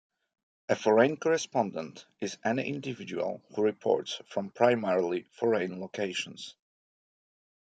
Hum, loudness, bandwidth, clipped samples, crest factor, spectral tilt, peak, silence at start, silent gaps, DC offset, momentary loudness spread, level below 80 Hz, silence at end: none; -30 LUFS; 9.2 kHz; under 0.1%; 22 dB; -5 dB/octave; -8 dBFS; 0.7 s; none; under 0.1%; 14 LU; -78 dBFS; 1.25 s